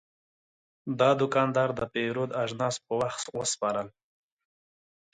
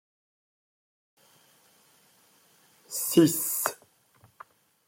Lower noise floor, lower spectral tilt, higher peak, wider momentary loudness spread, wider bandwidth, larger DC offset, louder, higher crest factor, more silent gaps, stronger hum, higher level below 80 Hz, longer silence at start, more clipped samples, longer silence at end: first, under -90 dBFS vs -62 dBFS; about the same, -4.5 dB/octave vs -4 dB/octave; second, -10 dBFS vs -6 dBFS; second, 9 LU vs 14 LU; second, 9.6 kHz vs 16.5 kHz; neither; second, -28 LUFS vs -25 LUFS; second, 20 dB vs 26 dB; neither; neither; first, -66 dBFS vs -76 dBFS; second, 0.85 s vs 2.9 s; neither; about the same, 1.25 s vs 1.15 s